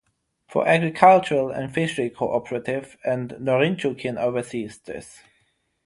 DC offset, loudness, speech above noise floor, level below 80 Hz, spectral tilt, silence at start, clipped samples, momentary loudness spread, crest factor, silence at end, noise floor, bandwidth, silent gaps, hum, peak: under 0.1%; -22 LUFS; 46 dB; -60 dBFS; -6 dB/octave; 0.5 s; under 0.1%; 16 LU; 22 dB; 0.75 s; -68 dBFS; 11.5 kHz; none; none; -2 dBFS